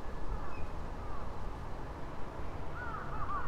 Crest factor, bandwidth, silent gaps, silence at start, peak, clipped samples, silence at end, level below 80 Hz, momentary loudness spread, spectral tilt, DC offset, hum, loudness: 12 dB; 8.2 kHz; none; 0 s; -22 dBFS; under 0.1%; 0 s; -42 dBFS; 4 LU; -7 dB/octave; under 0.1%; none; -44 LUFS